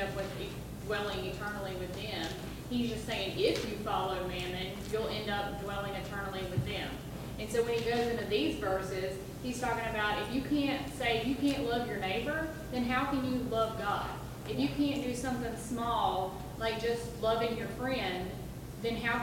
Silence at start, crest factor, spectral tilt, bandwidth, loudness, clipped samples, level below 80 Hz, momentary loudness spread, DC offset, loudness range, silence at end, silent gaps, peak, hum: 0 s; 18 dB; -5 dB/octave; 17 kHz; -34 LUFS; under 0.1%; -50 dBFS; 8 LU; under 0.1%; 3 LU; 0 s; none; -16 dBFS; none